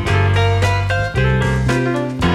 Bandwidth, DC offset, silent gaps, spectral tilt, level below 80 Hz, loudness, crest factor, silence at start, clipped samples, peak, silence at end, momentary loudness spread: 11.5 kHz; under 0.1%; none; -6.5 dB/octave; -28 dBFS; -16 LUFS; 12 dB; 0 s; under 0.1%; -4 dBFS; 0 s; 3 LU